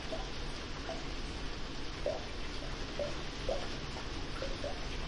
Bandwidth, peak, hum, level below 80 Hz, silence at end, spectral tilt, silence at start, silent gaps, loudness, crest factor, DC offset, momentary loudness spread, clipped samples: 11.5 kHz; -22 dBFS; none; -44 dBFS; 0 s; -4.5 dB/octave; 0 s; none; -41 LUFS; 16 dB; under 0.1%; 4 LU; under 0.1%